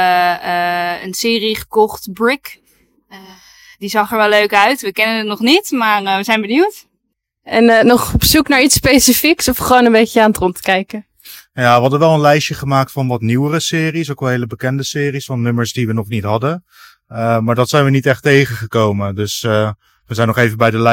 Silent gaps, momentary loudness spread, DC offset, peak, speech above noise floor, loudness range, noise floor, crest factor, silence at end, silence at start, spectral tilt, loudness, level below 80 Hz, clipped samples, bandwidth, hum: none; 9 LU; under 0.1%; 0 dBFS; 58 dB; 7 LU; -71 dBFS; 14 dB; 0 s; 0 s; -4.5 dB/octave; -13 LUFS; -38 dBFS; 0.2%; 17.5 kHz; none